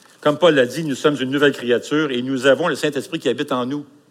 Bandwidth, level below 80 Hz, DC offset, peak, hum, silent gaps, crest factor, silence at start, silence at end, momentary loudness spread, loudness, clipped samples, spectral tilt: 15.5 kHz; -72 dBFS; under 0.1%; -2 dBFS; none; none; 16 dB; 0.2 s; 0.25 s; 8 LU; -19 LUFS; under 0.1%; -5 dB/octave